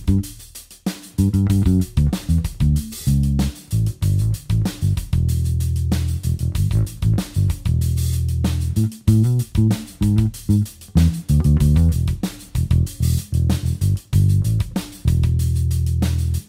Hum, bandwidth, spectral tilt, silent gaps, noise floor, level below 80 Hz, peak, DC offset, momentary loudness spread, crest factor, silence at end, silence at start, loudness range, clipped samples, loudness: none; 16 kHz; -7 dB/octave; none; -40 dBFS; -26 dBFS; -2 dBFS; under 0.1%; 6 LU; 16 dB; 0.05 s; 0 s; 2 LU; under 0.1%; -20 LUFS